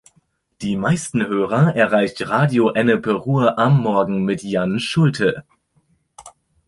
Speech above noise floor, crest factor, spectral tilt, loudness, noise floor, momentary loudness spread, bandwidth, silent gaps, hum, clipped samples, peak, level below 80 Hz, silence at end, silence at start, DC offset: 45 dB; 18 dB; -6.5 dB/octave; -18 LUFS; -62 dBFS; 6 LU; 11.5 kHz; none; none; under 0.1%; -2 dBFS; -54 dBFS; 0.4 s; 0.6 s; under 0.1%